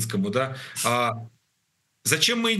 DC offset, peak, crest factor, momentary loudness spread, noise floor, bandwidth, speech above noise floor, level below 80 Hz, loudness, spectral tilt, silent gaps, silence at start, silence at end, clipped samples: under 0.1%; -4 dBFS; 22 dB; 9 LU; -73 dBFS; 13 kHz; 48 dB; -72 dBFS; -24 LUFS; -3 dB/octave; none; 0 s; 0 s; under 0.1%